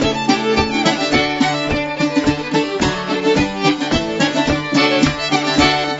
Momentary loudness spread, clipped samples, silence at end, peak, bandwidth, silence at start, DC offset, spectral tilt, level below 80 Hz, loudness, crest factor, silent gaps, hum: 5 LU; under 0.1%; 0 s; 0 dBFS; 8 kHz; 0 s; under 0.1%; -4.5 dB/octave; -36 dBFS; -16 LUFS; 16 dB; none; none